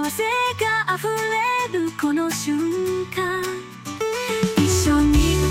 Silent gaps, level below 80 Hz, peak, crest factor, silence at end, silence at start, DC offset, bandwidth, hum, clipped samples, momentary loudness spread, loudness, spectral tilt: none; -32 dBFS; -8 dBFS; 14 dB; 0 s; 0 s; under 0.1%; 17 kHz; none; under 0.1%; 8 LU; -21 LUFS; -4.5 dB/octave